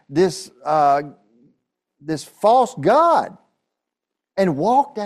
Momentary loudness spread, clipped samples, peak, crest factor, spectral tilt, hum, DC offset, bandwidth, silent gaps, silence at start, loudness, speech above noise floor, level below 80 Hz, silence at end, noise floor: 15 LU; under 0.1%; -4 dBFS; 16 dB; -6 dB/octave; none; under 0.1%; 13.5 kHz; none; 0.1 s; -18 LUFS; 66 dB; -62 dBFS; 0 s; -83 dBFS